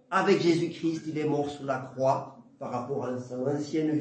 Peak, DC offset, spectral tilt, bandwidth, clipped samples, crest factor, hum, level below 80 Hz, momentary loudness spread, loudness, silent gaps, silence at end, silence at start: -10 dBFS; under 0.1%; -6.5 dB/octave; 8.8 kHz; under 0.1%; 18 dB; none; -72 dBFS; 11 LU; -29 LUFS; none; 0 s; 0.1 s